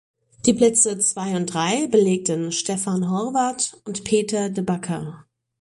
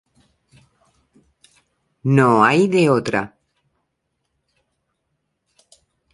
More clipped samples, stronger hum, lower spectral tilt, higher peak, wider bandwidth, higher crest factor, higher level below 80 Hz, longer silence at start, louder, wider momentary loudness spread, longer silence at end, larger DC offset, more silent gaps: neither; neither; second, -4 dB/octave vs -7 dB/octave; about the same, -4 dBFS vs -2 dBFS; about the same, 11.5 kHz vs 11.5 kHz; about the same, 18 dB vs 20 dB; about the same, -58 dBFS vs -62 dBFS; second, 0.45 s vs 2.05 s; second, -21 LUFS vs -16 LUFS; second, 9 LU vs 13 LU; second, 0.4 s vs 2.85 s; neither; neither